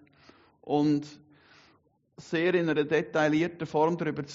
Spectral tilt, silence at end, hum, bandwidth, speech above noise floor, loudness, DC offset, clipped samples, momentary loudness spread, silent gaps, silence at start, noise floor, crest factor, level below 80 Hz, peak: -5 dB/octave; 0 s; none; 7.6 kHz; 39 dB; -28 LUFS; under 0.1%; under 0.1%; 6 LU; none; 0.65 s; -66 dBFS; 18 dB; -70 dBFS; -12 dBFS